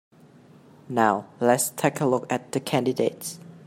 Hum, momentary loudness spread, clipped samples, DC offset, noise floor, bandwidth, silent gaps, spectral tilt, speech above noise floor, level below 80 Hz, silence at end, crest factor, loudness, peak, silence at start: none; 7 LU; under 0.1%; under 0.1%; -52 dBFS; 16.5 kHz; none; -4.5 dB/octave; 28 dB; -70 dBFS; 0.05 s; 20 dB; -24 LUFS; -4 dBFS; 0.9 s